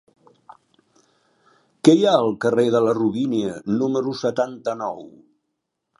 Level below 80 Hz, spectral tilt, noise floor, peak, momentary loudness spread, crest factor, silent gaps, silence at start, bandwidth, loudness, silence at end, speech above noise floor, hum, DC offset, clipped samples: -66 dBFS; -6 dB/octave; -78 dBFS; 0 dBFS; 11 LU; 22 dB; none; 1.85 s; 11.5 kHz; -20 LUFS; 0.9 s; 58 dB; none; under 0.1%; under 0.1%